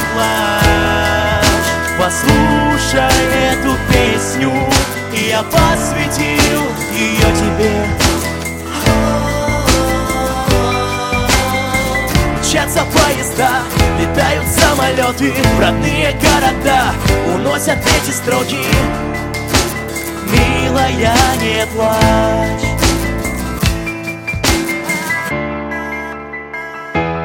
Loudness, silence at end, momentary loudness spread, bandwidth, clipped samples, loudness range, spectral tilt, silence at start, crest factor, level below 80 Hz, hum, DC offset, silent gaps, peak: -14 LUFS; 0 s; 8 LU; 17 kHz; under 0.1%; 3 LU; -4 dB/octave; 0 s; 14 dB; -24 dBFS; none; 0.1%; none; 0 dBFS